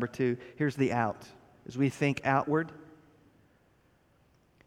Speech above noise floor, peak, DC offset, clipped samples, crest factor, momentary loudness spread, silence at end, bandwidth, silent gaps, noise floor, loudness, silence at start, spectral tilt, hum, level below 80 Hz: 36 dB; -12 dBFS; under 0.1%; under 0.1%; 22 dB; 16 LU; 1.85 s; 13 kHz; none; -66 dBFS; -31 LUFS; 0 s; -7 dB/octave; none; -68 dBFS